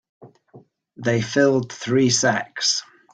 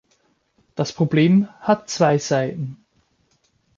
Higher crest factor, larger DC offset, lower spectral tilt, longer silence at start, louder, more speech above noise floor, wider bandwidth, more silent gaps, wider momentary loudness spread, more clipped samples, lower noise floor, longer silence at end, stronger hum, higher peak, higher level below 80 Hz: about the same, 18 dB vs 18 dB; neither; second, -3.5 dB/octave vs -6 dB/octave; second, 0.2 s vs 0.75 s; about the same, -20 LUFS vs -20 LUFS; second, 31 dB vs 45 dB; first, 10 kHz vs 7.6 kHz; neither; second, 6 LU vs 14 LU; neither; second, -50 dBFS vs -64 dBFS; second, 0.3 s vs 1.05 s; neither; about the same, -4 dBFS vs -4 dBFS; about the same, -60 dBFS vs -62 dBFS